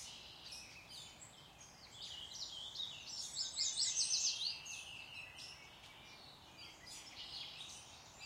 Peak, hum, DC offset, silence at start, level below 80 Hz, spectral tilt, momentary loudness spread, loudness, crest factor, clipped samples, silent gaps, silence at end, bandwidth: -24 dBFS; none; under 0.1%; 0 s; -74 dBFS; 1 dB/octave; 21 LU; -42 LUFS; 24 dB; under 0.1%; none; 0 s; 16 kHz